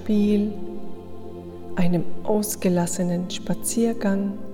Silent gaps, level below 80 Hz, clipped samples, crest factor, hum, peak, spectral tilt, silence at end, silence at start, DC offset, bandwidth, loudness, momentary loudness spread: none; -48 dBFS; under 0.1%; 14 dB; none; -8 dBFS; -6 dB/octave; 0 s; 0 s; under 0.1%; 17.5 kHz; -24 LUFS; 16 LU